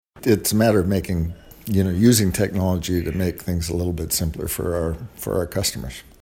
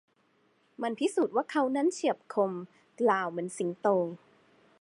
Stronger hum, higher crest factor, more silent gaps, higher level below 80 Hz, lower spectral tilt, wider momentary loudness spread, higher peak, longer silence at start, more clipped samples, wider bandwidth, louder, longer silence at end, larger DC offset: neither; about the same, 20 dB vs 20 dB; neither; first, -38 dBFS vs -86 dBFS; about the same, -5.5 dB/octave vs -5 dB/octave; about the same, 9 LU vs 9 LU; first, -2 dBFS vs -12 dBFS; second, 0.15 s vs 0.8 s; neither; first, 16.5 kHz vs 11.5 kHz; first, -21 LUFS vs -30 LUFS; second, 0.2 s vs 0.65 s; neither